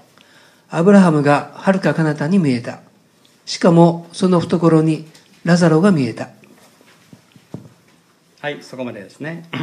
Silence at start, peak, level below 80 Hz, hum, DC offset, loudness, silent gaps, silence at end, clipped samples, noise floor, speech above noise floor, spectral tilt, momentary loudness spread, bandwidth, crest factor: 0.7 s; 0 dBFS; -64 dBFS; none; under 0.1%; -15 LUFS; none; 0 s; under 0.1%; -54 dBFS; 39 dB; -7 dB/octave; 18 LU; 10.5 kHz; 16 dB